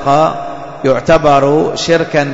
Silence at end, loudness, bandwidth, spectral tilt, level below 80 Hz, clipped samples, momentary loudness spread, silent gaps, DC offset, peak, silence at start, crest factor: 0 s; -11 LUFS; 8 kHz; -5.5 dB/octave; -36 dBFS; under 0.1%; 9 LU; none; under 0.1%; 0 dBFS; 0 s; 10 dB